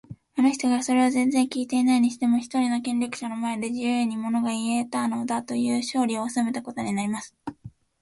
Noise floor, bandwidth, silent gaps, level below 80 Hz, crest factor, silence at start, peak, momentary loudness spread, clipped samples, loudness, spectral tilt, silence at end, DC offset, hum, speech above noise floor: -47 dBFS; 11.5 kHz; none; -66 dBFS; 16 dB; 0.1 s; -10 dBFS; 8 LU; under 0.1%; -25 LUFS; -4 dB/octave; 0.35 s; under 0.1%; none; 23 dB